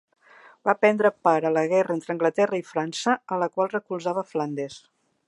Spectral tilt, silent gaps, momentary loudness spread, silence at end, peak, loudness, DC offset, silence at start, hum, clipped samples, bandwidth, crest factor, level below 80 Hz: -5.5 dB/octave; none; 8 LU; 0.5 s; -4 dBFS; -24 LUFS; under 0.1%; 0.65 s; none; under 0.1%; 11.5 kHz; 20 dB; -78 dBFS